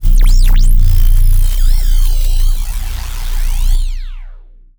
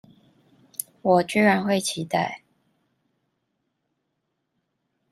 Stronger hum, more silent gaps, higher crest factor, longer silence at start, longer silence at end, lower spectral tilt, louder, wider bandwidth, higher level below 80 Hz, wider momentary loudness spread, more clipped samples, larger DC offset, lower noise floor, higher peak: neither; neither; second, 8 dB vs 22 dB; second, 0 s vs 0.8 s; second, 0.35 s vs 2.75 s; about the same, -4 dB/octave vs -4.5 dB/octave; first, -16 LUFS vs -22 LUFS; first, over 20 kHz vs 14.5 kHz; first, -8 dBFS vs -68 dBFS; second, 10 LU vs 15 LU; neither; neither; second, -34 dBFS vs -77 dBFS; first, 0 dBFS vs -6 dBFS